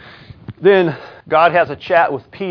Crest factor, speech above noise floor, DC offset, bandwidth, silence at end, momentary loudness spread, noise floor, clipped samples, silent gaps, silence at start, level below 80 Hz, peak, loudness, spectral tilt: 16 dB; 22 dB; under 0.1%; 5.4 kHz; 0 s; 9 LU; -36 dBFS; under 0.1%; none; 0.5 s; -54 dBFS; 0 dBFS; -15 LUFS; -8 dB/octave